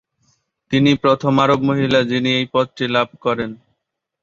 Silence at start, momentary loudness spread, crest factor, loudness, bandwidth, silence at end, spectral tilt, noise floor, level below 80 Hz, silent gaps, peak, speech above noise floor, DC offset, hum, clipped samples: 0.7 s; 7 LU; 16 dB; -17 LUFS; 7.6 kHz; 0.65 s; -6.5 dB/octave; -76 dBFS; -54 dBFS; none; -2 dBFS; 59 dB; under 0.1%; none; under 0.1%